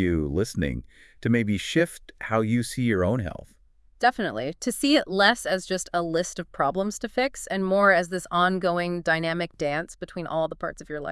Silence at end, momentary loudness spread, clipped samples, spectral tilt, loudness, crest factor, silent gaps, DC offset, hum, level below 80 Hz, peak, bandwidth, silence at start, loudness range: 0 s; 11 LU; under 0.1%; -5 dB/octave; -25 LUFS; 20 dB; none; under 0.1%; none; -48 dBFS; -4 dBFS; 12 kHz; 0 s; 2 LU